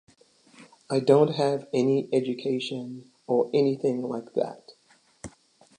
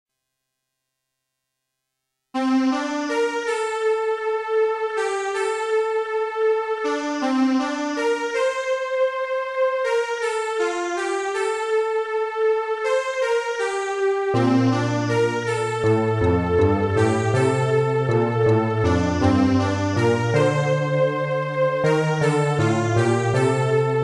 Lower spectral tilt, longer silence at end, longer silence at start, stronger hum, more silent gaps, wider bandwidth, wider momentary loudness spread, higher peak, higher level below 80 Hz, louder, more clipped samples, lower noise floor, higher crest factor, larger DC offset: about the same, -6.5 dB/octave vs -6.5 dB/octave; first, 0.5 s vs 0 s; second, 0.6 s vs 2.35 s; neither; neither; about the same, 10.5 kHz vs 11.5 kHz; first, 22 LU vs 5 LU; about the same, -6 dBFS vs -6 dBFS; second, -68 dBFS vs -48 dBFS; second, -26 LUFS vs -21 LUFS; neither; second, -62 dBFS vs -79 dBFS; first, 20 dB vs 14 dB; neither